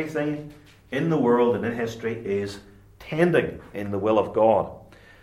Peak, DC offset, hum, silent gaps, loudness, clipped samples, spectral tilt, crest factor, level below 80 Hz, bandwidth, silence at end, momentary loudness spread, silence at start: -6 dBFS; under 0.1%; none; none; -24 LUFS; under 0.1%; -7.5 dB/octave; 18 dB; -56 dBFS; 14 kHz; 0.4 s; 14 LU; 0 s